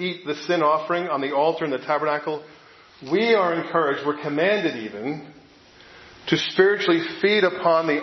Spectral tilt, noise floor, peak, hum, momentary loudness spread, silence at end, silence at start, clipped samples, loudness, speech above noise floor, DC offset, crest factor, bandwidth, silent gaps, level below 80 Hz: -5.5 dB/octave; -50 dBFS; -2 dBFS; none; 12 LU; 0 s; 0 s; under 0.1%; -22 LUFS; 28 dB; under 0.1%; 20 dB; 6.2 kHz; none; -68 dBFS